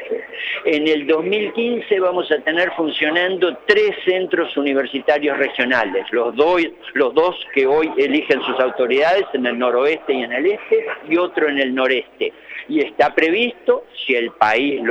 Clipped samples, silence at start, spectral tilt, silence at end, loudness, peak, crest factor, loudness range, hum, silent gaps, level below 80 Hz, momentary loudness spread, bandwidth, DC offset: under 0.1%; 0 s; -5 dB/octave; 0 s; -18 LUFS; 0 dBFS; 18 dB; 1 LU; none; none; -62 dBFS; 5 LU; 7.6 kHz; under 0.1%